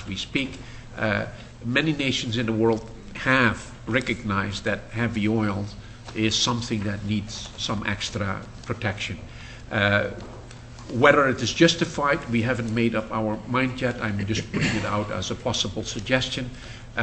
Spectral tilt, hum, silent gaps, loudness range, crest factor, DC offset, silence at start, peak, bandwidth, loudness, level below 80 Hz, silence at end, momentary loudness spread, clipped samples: -4.5 dB/octave; none; none; 5 LU; 24 dB; under 0.1%; 0 s; -2 dBFS; 8.6 kHz; -24 LUFS; -44 dBFS; 0 s; 16 LU; under 0.1%